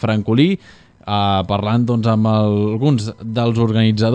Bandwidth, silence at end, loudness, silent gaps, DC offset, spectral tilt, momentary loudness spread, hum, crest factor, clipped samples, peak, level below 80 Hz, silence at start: 9 kHz; 0 s; -17 LUFS; none; under 0.1%; -8 dB/octave; 6 LU; none; 16 dB; under 0.1%; 0 dBFS; -50 dBFS; 0 s